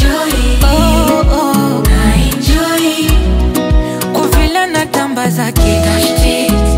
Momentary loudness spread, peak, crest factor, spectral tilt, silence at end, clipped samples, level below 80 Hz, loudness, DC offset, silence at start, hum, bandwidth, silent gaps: 4 LU; 0 dBFS; 10 dB; -5 dB/octave; 0 s; under 0.1%; -14 dBFS; -11 LUFS; under 0.1%; 0 s; none; 16.5 kHz; none